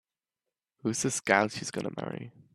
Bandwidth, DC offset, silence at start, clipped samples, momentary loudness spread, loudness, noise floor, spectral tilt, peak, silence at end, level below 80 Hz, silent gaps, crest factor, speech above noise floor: 13.5 kHz; under 0.1%; 0.85 s; under 0.1%; 13 LU; -30 LUFS; -90 dBFS; -3.5 dB/octave; -6 dBFS; 0.25 s; -70 dBFS; none; 26 dB; 59 dB